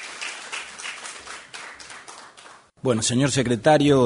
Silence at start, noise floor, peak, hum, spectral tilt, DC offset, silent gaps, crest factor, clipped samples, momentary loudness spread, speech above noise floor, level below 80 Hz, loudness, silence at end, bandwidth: 0 s; -48 dBFS; -4 dBFS; none; -4.5 dB/octave; under 0.1%; none; 18 dB; under 0.1%; 21 LU; 30 dB; -56 dBFS; -23 LUFS; 0 s; 11 kHz